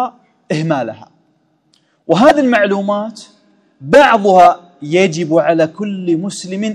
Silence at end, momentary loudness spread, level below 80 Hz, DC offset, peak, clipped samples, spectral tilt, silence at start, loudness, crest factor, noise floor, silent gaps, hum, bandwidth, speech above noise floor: 0 s; 14 LU; -54 dBFS; under 0.1%; 0 dBFS; 0.7%; -5.5 dB/octave; 0 s; -13 LUFS; 14 dB; -58 dBFS; none; none; 12 kHz; 46 dB